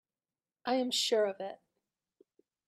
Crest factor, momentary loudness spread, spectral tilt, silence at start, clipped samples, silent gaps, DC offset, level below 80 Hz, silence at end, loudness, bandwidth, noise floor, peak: 18 dB; 14 LU; -2 dB/octave; 0.65 s; under 0.1%; none; under 0.1%; -86 dBFS; 1.1 s; -32 LUFS; 14.5 kHz; under -90 dBFS; -18 dBFS